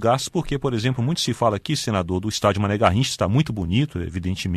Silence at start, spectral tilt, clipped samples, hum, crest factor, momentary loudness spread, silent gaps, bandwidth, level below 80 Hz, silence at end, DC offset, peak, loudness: 0 s; -5.5 dB/octave; under 0.1%; none; 20 dB; 6 LU; none; 13.5 kHz; -42 dBFS; 0 s; under 0.1%; -2 dBFS; -22 LUFS